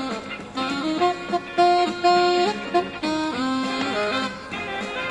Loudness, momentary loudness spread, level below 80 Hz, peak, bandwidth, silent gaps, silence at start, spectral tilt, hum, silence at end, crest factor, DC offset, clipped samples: -23 LUFS; 10 LU; -56 dBFS; -6 dBFS; 11.5 kHz; none; 0 s; -4 dB/octave; none; 0 s; 18 dB; under 0.1%; under 0.1%